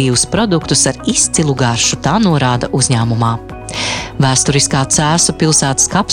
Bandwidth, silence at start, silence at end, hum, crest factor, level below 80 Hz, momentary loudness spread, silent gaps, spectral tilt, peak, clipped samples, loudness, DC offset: 17.5 kHz; 0 s; 0 s; none; 12 dB; -36 dBFS; 7 LU; none; -3.5 dB/octave; 0 dBFS; under 0.1%; -12 LUFS; under 0.1%